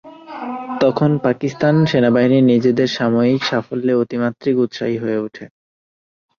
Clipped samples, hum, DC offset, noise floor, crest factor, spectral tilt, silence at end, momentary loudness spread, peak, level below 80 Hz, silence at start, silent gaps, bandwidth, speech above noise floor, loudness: under 0.1%; none; under 0.1%; under -90 dBFS; 14 dB; -7.5 dB/octave; 0.9 s; 12 LU; -2 dBFS; -58 dBFS; 0.05 s; none; 7 kHz; over 74 dB; -17 LUFS